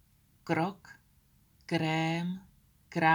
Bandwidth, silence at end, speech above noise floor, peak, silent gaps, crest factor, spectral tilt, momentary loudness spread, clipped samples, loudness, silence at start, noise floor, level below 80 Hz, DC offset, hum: over 20 kHz; 0 s; 34 dB; -12 dBFS; none; 20 dB; -6 dB/octave; 20 LU; under 0.1%; -33 LUFS; 0.45 s; -66 dBFS; -68 dBFS; under 0.1%; none